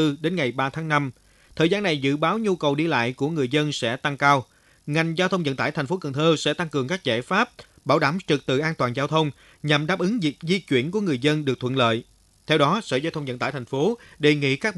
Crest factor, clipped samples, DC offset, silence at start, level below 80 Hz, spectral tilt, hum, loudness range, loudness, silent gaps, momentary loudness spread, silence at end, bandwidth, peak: 20 dB; under 0.1%; under 0.1%; 0 s; -60 dBFS; -5.5 dB/octave; none; 1 LU; -23 LUFS; none; 6 LU; 0 s; 12 kHz; -4 dBFS